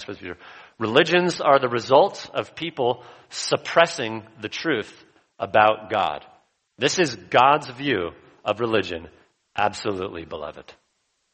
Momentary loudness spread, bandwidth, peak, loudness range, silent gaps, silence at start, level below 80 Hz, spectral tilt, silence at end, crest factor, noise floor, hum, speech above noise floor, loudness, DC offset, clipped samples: 16 LU; 8.4 kHz; 0 dBFS; 4 LU; none; 0 s; -60 dBFS; -4 dB/octave; 0.6 s; 22 dB; -71 dBFS; none; 49 dB; -22 LUFS; under 0.1%; under 0.1%